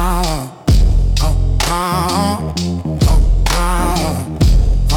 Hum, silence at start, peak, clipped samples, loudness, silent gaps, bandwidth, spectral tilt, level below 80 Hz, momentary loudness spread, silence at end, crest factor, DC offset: none; 0 s; -4 dBFS; under 0.1%; -16 LUFS; none; 17 kHz; -5 dB/octave; -14 dBFS; 6 LU; 0 s; 10 dB; under 0.1%